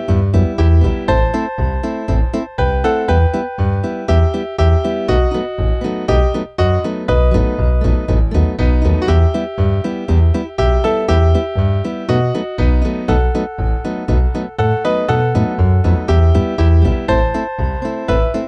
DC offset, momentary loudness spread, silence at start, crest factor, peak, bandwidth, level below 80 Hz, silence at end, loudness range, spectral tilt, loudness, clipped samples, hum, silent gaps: under 0.1%; 6 LU; 0 s; 12 dB; -2 dBFS; 6.6 kHz; -18 dBFS; 0 s; 2 LU; -8.5 dB/octave; -16 LUFS; under 0.1%; none; none